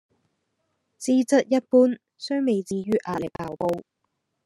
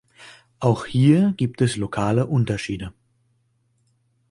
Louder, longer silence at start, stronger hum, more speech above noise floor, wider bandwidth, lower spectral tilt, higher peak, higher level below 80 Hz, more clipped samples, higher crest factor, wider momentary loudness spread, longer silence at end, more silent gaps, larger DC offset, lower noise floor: second, -24 LUFS vs -21 LUFS; first, 1 s vs 0.2 s; neither; first, 54 dB vs 46 dB; about the same, 12 kHz vs 11.5 kHz; second, -5.5 dB/octave vs -7 dB/octave; about the same, -6 dBFS vs -4 dBFS; second, -64 dBFS vs -50 dBFS; neither; about the same, 18 dB vs 18 dB; about the same, 13 LU vs 12 LU; second, 0.65 s vs 1.4 s; neither; neither; first, -77 dBFS vs -66 dBFS